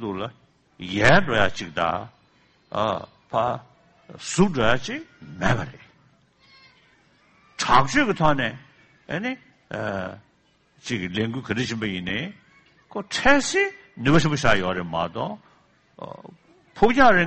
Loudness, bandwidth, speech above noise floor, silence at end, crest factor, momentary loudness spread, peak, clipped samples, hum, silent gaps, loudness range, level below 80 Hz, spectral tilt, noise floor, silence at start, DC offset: -23 LUFS; 8.4 kHz; 41 dB; 0 s; 20 dB; 19 LU; -4 dBFS; under 0.1%; none; none; 7 LU; -46 dBFS; -5 dB/octave; -63 dBFS; 0 s; under 0.1%